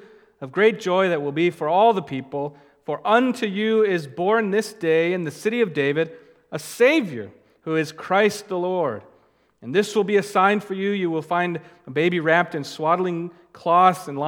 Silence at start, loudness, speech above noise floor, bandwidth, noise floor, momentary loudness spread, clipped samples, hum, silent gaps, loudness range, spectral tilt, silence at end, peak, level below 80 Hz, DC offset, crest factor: 0.4 s; -21 LUFS; 38 dB; 18 kHz; -59 dBFS; 14 LU; under 0.1%; none; none; 2 LU; -5.5 dB/octave; 0 s; -2 dBFS; -74 dBFS; under 0.1%; 20 dB